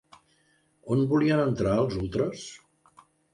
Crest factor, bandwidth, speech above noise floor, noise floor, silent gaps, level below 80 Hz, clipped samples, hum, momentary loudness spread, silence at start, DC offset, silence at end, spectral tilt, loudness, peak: 16 dB; 11 kHz; 42 dB; -67 dBFS; none; -52 dBFS; under 0.1%; none; 18 LU; 0.85 s; under 0.1%; 0.8 s; -7 dB/octave; -26 LUFS; -12 dBFS